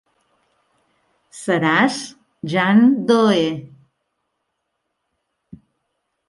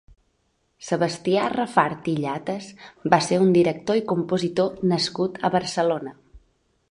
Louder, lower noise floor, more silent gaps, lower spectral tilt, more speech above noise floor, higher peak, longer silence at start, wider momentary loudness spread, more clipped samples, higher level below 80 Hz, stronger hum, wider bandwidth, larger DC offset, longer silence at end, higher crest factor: first, -17 LUFS vs -23 LUFS; first, -75 dBFS vs -69 dBFS; neither; about the same, -5.5 dB/octave vs -5.5 dB/octave; first, 59 dB vs 47 dB; about the same, -2 dBFS vs -2 dBFS; first, 1.35 s vs 0.8 s; first, 18 LU vs 12 LU; neither; second, -66 dBFS vs -60 dBFS; neither; about the same, 11.5 kHz vs 11 kHz; neither; first, 2.65 s vs 0.5 s; about the same, 20 dB vs 20 dB